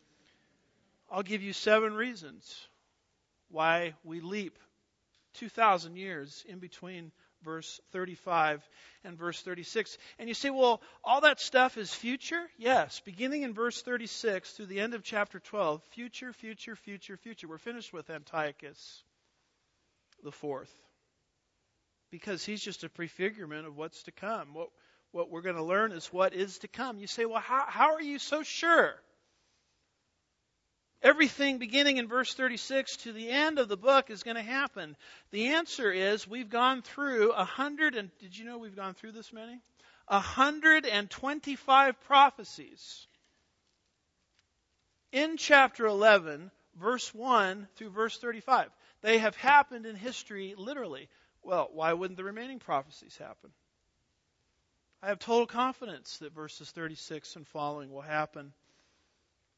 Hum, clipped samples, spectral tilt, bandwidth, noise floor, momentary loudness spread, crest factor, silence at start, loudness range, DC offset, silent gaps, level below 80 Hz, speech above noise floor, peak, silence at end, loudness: none; under 0.1%; -3 dB/octave; 8 kHz; -79 dBFS; 21 LU; 26 dB; 1.1 s; 13 LU; under 0.1%; none; -74 dBFS; 48 dB; -6 dBFS; 1.05 s; -30 LUFS